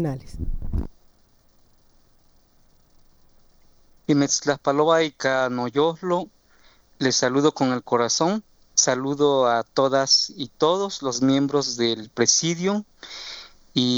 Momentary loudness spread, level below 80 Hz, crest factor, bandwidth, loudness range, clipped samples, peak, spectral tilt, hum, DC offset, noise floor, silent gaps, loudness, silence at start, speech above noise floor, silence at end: 15 LU; -40 dBFS; 18 dB; over 20 kHz; 8 LU; under 0.1%; -4 dBFS; -3.5 dB/octave; none; under 0.1%; -58 dBFS; none; -22 LUFS; 0 s; 36 dB; 0 s